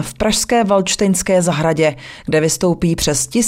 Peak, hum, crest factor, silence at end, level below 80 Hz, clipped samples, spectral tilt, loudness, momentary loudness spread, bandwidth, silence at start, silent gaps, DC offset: -2 dBFS; none; 12 dB; 0 s; -38 dBFS; under 0.1%; -4 dB/octave; -15 LUFS; 3 LU; 16 kHz; 0 s; none; under 0.1%